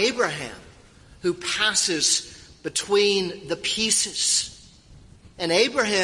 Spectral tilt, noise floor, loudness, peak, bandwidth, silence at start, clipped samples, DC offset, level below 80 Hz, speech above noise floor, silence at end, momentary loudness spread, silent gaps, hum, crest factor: -1.5 dB/octave; -50 dBFS; -22 LUFS; -6 dBFS; 12 kHz; 0 s; under 0.1%; under 0.1%; -56 dBFS; 27 dB; 0 s; 12 LU; none; none; 18 dB